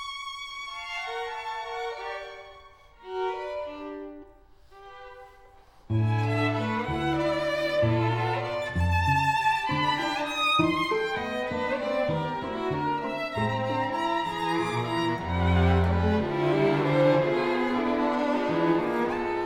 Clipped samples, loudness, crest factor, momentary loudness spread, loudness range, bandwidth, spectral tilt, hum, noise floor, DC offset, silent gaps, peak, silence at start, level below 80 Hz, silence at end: under 0.1%; -27 LUFS; 16 dB; 12 LU; 11 LU; 14.5 kHz; -6.5 dB/octave; none; -53 dBFS; under 0.1%; none; -10 dBFS; 0 s; -46 dBFS; 0 s